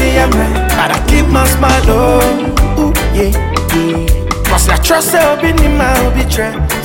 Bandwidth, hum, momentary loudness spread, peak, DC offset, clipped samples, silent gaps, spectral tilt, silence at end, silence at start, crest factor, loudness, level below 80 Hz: 17 kHz; none; 5 LU; 0 dBFS; under 0.1%; under 0.1%; none; -5 dB/octave; 0 s; 0 s; 10 dB; -11 LUFS; -14 dBFS